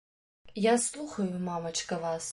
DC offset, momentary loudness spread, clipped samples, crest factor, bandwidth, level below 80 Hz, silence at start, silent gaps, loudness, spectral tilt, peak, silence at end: under 0.1%; 8 LU; under 0.1%; 18 dB; 11.5 kHz; -66 dBFS; 0.45 s; none; -31 LUFS; -4 dB/octave; -14 dBFS; 0 s